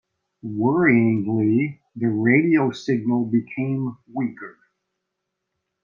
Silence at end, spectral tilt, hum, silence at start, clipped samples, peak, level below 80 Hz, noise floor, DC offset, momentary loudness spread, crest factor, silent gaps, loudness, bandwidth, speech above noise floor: 1.35 s; -8.5 dB/octave; none; 0.45 s; under 0.1%; -4 dBFS; -64 dBFS; -80 dBFS; under 0.1%; 12 LU; 18 dB; none; -21 LUFS; 7.2 kHz; 60 dB